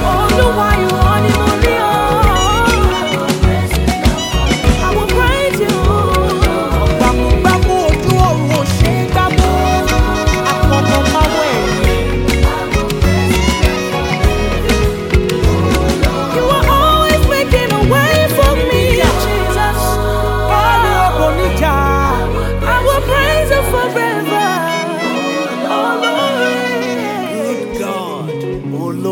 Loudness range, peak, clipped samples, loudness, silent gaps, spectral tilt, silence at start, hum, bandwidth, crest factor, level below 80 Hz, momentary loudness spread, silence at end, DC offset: 3 LU; 0 dBFS; under 0.1%; -13 LUFS; none; -5 dB/octave; 0 s; none; 17.5 kHz; 12 dB; -18 dBFS; 5 LU; 0 s; under 0.1%